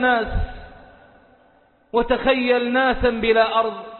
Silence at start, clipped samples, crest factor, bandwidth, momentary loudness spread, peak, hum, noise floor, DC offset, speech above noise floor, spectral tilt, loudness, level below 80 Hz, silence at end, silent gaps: 0 s; under 0.1%; 16 dB; 4.4 kHz; 9 LU; -4 dBFS; none; -56 dBFS; under 0.1%; 37 dB; -10 dB/octave; -19 LUFS; -36 dBFS; 0 s; none